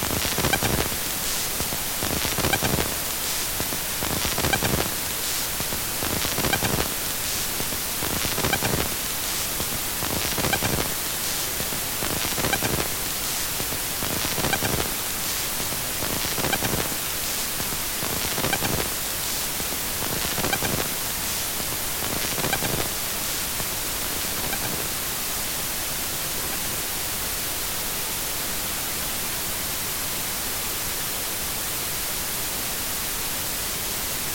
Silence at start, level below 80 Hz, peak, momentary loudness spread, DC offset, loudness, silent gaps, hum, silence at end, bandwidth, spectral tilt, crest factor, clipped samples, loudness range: 0 s; -42 dBFS; -6 dBFS; 3 LU; under 0.1%; -24 LUFS; none; none; 0 s; 17 kHz; -2 dB/octave; 20 dB; under 0.1%; 2 LU